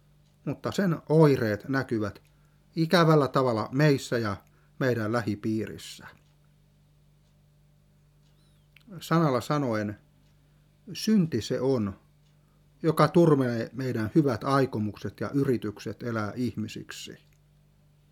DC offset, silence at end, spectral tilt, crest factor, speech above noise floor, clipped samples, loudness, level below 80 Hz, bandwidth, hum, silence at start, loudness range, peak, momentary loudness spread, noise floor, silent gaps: under 0.1%; 0.95 s; -7 dB/octave; 22 dB; 35 dB; under 0.1%; -27 LUFS; -64 dBFS; 16 kHz; 50 Hz at -55 dBFS; 0.45 s; 8 LU; -6 dBFS; 17 LU; -61 dBFS; none